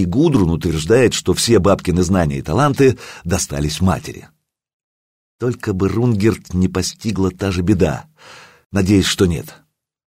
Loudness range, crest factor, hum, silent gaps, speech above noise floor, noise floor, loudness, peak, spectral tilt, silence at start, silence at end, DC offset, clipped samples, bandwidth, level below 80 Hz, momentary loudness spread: 5 LU; 14 dB; none; 4.73-5.39 s, 8.66-8.70 s; over 74 dB; under -90 dBFS; -17 LUFS; -2 dBFS; -5.5 dB/octave; 0 s; 0.55 s; under 0.1%; under 0.1%; 16 kHz; -36 dBFS; 10 LU